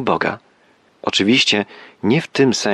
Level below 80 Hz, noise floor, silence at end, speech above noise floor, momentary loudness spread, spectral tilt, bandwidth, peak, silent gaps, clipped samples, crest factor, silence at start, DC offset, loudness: -60 dBFS; -55 dBFS; 0 s; 38 dB; 14 LU; -4 dB/octave; 12 kHz; -4 dBFS; none; under 0.1%; 16 dB; 0 s; under 0.1%; -17 LUFS